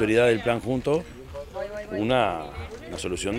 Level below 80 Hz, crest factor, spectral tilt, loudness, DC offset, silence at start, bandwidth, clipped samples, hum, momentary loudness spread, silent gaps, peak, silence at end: -46 dBFS; 18 dB; -5.5 dB/octave; -25 LUFS; under 0.1%; 0 s; 15.5 kHz; under 0.1%; none; 16 LU; none; -8 dBFS; 0 s